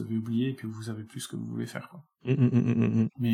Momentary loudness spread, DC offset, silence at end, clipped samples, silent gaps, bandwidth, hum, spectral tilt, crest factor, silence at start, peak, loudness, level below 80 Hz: 14 LU; under 0.1%; 0 s; under 0.1%; none; 16.5 kHz; none; -7.5 dB/octave; 16 dB; 0 s; -12 dBFS; -29 LUFS; -68 dBFS